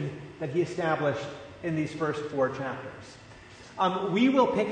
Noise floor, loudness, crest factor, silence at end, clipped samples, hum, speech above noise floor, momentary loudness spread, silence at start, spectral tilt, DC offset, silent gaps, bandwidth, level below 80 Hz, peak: -49 dBFS; -28 LUFS; 18 dB; 0 s; under 0.1%; none; 21 dB; 22 LU; 0 s; -6.5 dB/octave; under 0.1%; none; 9.6 kHz; -62 dBFS; -10 dBFS